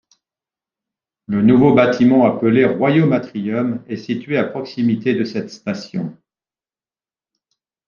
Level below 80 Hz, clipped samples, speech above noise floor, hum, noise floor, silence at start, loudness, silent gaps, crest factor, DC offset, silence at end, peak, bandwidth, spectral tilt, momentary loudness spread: -56 dBFS; under 0.1%; over 74 dB; none; under -90 dBFS; 1.3 s; -17 LUFS; none; 16 dB; under 0.1%; 1.75 s; -2 dBFS; 7 kHz; -8 dB/octave; 14 LU